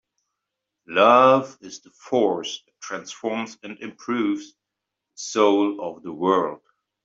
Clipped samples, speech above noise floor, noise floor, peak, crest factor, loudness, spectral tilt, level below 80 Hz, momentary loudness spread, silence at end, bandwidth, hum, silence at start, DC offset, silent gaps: under 0.1%; 62 dB; -84 dBFS; -2 dBFS; 20 dB; -21 LUFS; -4.5 dB/octave; -70 dBFS; 20 LU; 0.5 s; 7.8 kHz; none; 0.9 s; under 0.1%; none